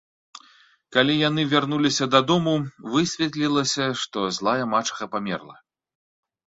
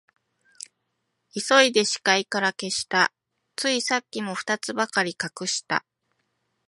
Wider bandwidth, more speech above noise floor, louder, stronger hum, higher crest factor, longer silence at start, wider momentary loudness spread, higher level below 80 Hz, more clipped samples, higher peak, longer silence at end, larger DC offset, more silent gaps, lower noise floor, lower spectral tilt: second, 8 kHz vs 11.5 kHz; second, 34 dB vs 53 dB; about the same, -22 LUFS vs -23 LUFS; neither; about the same, 20 dB vs 24 dB; second, 0.35 s vs 1.35 s; second, 9 LU vs 18 LU; first, -62 dBFS vs -74 dBFS; neither; about the same, -2 dBFS vs -2 dBFS; about the same, 0.95 s vs 0.9 s; neither; neither; second, -56 dBFS vs -77 dBFS; first, -4 dB/octave vs -2 dB/octave